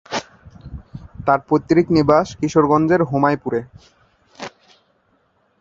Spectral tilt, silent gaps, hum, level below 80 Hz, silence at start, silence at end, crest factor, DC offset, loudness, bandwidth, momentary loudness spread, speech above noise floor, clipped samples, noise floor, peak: -7 dB/octave; none; none; -46 dBFS; 0.1 s; 1.15 s; 20 dB; under 0.1%; -17 LUFS; 7.8 kHz; 22 LU; 46 dB; under 0.1%; -62 dBFS; 0 dBFS